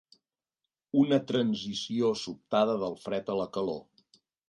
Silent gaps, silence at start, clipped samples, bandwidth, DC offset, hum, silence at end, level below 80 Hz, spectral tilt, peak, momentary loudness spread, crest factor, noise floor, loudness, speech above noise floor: none; 0.95 s; under 0.1%; 11 kHz; under 0.1%; none; 0.65 s; -70 dBFS; -6 dB/octave; -12 dBFS; 9 LU; 20 dB; -89 dBFS; -30 LUFS; 60 dB